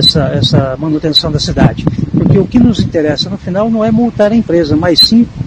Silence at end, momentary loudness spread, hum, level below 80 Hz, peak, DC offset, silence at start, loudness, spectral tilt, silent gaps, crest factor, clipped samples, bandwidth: 0 s; 8 LU; none; -30 dBFS; 0 dBFS; under 0.1%; 0 s; -10 LUFS; -6 dB/octave; none; 10 dB; 0.7%; 11 kHz